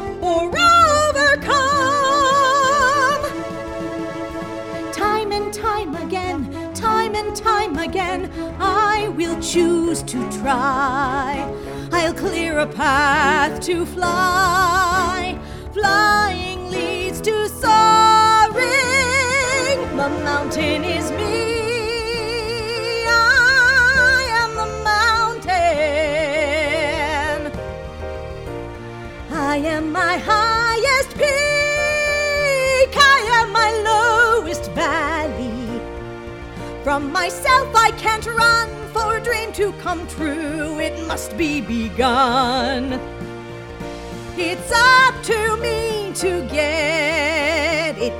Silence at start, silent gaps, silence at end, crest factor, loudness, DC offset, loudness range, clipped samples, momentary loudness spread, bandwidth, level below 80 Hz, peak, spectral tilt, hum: 0 s; none; 0 s; 18 dB; -17 LUFS; under 0.1%; 7 LU; under 0.1%; 15 LU; 17.5 kHz; -38 dBFS; -2 dBFS; -3.5 dB/octave; none